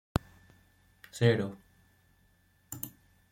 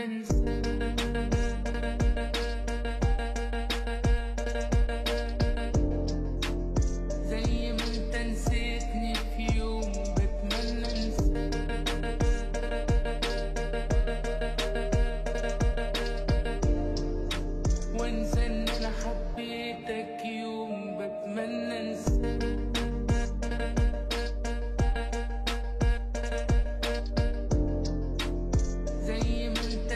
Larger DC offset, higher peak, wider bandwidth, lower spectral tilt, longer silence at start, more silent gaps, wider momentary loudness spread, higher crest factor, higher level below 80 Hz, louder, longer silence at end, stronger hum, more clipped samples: neither; first, -8 dBFS vs -16 dBFS; first, 16.5 kHz vs 12.5 kHz; about the same, -6 dB/octave vs -5.5 dB/octave; first, 1.15 s vs 0 s; neither; first, 20 LU vs 4 LU; first, 28 dB vs 12 dB; second, -54 dBFS vs -30 dBFS; about the same, -32 LUFS vs -31 LUFS; first, 0.45 s vs 0 s; neither; neither